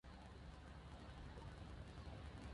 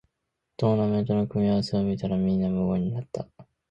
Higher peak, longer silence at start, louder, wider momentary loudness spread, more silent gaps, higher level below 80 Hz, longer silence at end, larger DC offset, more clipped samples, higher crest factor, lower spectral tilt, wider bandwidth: second, -42 dBFS vs -10 dBFS; second, 0.05 s vs 0.6 s; second, -57 LUFS vs -26 LUFS; second, 3 LU vs 10 LU; neither; second, -58 dBFS vs -52 dBFS; second, 0 s vs 0.25 s; neither; neither; about the same, 14 dB vs 16 dB; second, -6 dB/octave vs -9 dB/octave; first, 11 kHz vs 8.4 kHz